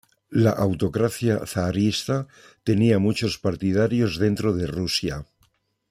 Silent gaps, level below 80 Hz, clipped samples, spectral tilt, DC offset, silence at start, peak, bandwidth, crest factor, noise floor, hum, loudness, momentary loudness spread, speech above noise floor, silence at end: none; -50 dBFS; under 0.1%; -6 dB/octave; under 0.1%; 0.3 s; -6 dBFS; 15.5 kHz; 18 dB; -66 dBFS; none; -23 LUFS; 8 LU; 43 dB; 0.65 s